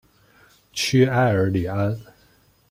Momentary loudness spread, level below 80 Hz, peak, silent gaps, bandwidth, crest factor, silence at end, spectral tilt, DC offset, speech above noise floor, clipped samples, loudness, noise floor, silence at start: 12 LU; -54 dBFS; -4 dBFS; none; 16 kHz; 18 dB; 0.7 s; -5.5 dB/octave; under 0.1%; 38 dB; under 0.1%; -21 LUFS; -58 dBFS; 0.75 s